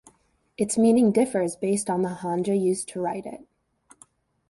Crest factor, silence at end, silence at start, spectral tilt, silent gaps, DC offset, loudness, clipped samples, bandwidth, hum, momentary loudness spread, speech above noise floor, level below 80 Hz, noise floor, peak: 16 dB; 1.15 s; 0.6 s; -6 dB/octave; none; under 0.1%; -24 LUFS; under 0.1%; 11.5 kHz; none; 11 LU; 37 dB; -64 dBFS; -60 dBFS; -8 dBFS